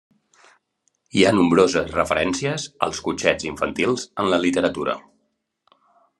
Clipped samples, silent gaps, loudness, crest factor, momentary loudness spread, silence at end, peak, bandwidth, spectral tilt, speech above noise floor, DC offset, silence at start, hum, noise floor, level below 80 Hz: under 0.1%; none; -21 LUFS; 22 dB; 10 LU; 1.2 s; 0 dBFS; 12 kHz; -4.5 dB/octave; 52 dB; under 0.1%; 1.15 s; none; -72 dBFS; -54 dBFS